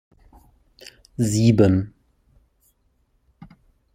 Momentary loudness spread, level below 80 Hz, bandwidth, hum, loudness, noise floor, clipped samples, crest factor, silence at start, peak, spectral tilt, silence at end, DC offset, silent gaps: 22 LU; -50 dBFS; 16 kHz; none; -19 LUFS; -66 dBFS; under 0.1%; 22 dB; 1.2 s; -2 dBFS; -7 dB/octave; 0.5 s; under 0.1%; none